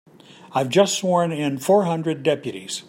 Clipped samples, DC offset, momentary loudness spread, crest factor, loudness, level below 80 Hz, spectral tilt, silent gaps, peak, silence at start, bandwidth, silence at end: under 0.1%; under 0.1%; 8 LU; 18 dB; -21 LUFS; -70 dBFS; -4.5 dB/octave; none; -4 dBFS; 0.45 s; 16 kHz; 0.05 s